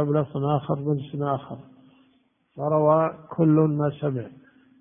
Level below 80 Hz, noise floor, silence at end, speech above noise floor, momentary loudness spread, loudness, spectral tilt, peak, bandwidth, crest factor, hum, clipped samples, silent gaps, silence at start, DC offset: -64 dBFS; -65 dBFS; 0.5 s; 41 dB; 13 LU; -24 LUFS; -13 dB/octave; -6 dBFS; 3.7 kHz; 18 dB; none; under 0.1%; none; 0 s; under 0.1%